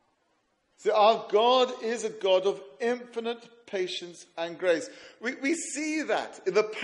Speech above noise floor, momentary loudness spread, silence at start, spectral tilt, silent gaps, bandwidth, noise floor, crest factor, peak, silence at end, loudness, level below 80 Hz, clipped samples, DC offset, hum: 45 dB; 14 LU; 0.8 s; -2.5 dB/octave; none; 11.5 kHz; -72 dBFS; 20 dB; -10 dBFS; 0 s; -28 LUFS; -82 dBFS; under 0.1%; under 0.1%; none